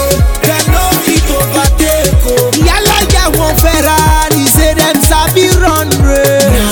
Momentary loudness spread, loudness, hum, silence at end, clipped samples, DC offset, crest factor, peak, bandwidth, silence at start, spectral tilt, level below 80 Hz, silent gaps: 2 LU; -8 LUFS; none; 0 s; 0.5%; under 0.1%; 8 dB; 0 dBFS; over 20 kHz; 0 s; -4 dB/octave; -14 dBFS; none